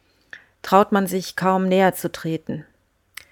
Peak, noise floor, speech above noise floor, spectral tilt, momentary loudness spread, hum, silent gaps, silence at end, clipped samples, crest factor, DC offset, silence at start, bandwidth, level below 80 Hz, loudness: 0 dBFS; -46 dBFS; 26 dB; -5.5 dB/octave; 17 LU; none; none; 0.7 s; under 0.1%; 22 dB; under 0.1%; 0.35 s; 19 kHz; -60 dBFS; -20 LUFS